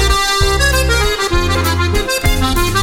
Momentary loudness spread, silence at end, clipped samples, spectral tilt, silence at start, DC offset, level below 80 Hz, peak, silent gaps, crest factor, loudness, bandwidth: 3 LU; 0 s; under 0.1%; -3.5 dB/octave; 0 s; under 0.1%; -18 dBFS; 0 dBFS; none; 14 dB; -14 LUFS; 17 kHz